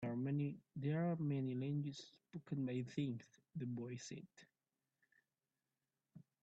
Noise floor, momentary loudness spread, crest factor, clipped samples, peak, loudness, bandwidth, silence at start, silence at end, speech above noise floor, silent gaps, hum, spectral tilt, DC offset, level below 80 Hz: under -90 dBFS; 15 LU; 16 dB; under 0.1%; -28 dBFS; -44 LUFS; 8 kHz; 0 s; 0.2 s; over 46 dB; none; none; -7.5 dB/octave; under 0.1%; -84 dBFS